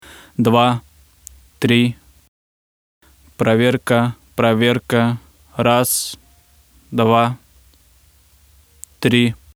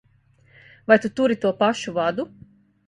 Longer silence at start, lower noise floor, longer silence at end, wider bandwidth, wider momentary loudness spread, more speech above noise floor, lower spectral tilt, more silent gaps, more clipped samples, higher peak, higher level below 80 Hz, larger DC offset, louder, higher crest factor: second, 0.4 s vs 0.9 s; second, -52 dBFS vs -58 dBFS; second, 0.2 s vs 0.6 s; first, 17.5 kHz vs 11 kHz; about the same, 13 LU vs 14 LU; about the same, 37 dB vs 38 dB; about the same, -5 dB/octave vs -5 dB/octave; first, 2.28-3.01 s vs none; neither; about the same, 0 dBFS vs -2 dBFS; first, -52 dBFS vs -62 dBFS; neither; first, -17 LUFS vs -21 LUFS; about the same, 20 dB vs 22 dB